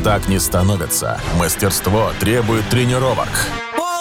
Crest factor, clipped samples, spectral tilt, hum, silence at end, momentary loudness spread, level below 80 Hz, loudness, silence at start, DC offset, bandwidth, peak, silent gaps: 12 dB; under 0.1%; -4.5 dB/octave; none; 0 s; 4 LU; -30 dBFS; -17 LUFS; 0 s; 0.2%; 17.5 kHz; -4 dBFS; none